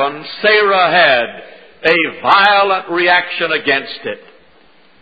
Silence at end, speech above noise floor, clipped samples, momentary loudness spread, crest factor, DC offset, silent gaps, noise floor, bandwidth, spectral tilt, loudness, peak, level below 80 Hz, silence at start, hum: 0.85 s; 36 dB; under 0.1%; 14 LU; 14 dB; 0.4%; none; -49 dBFS; 8 kHz; -5 dB/octave; -12 LUFS; 0 dBFS; -58 dBFS; 0 s; none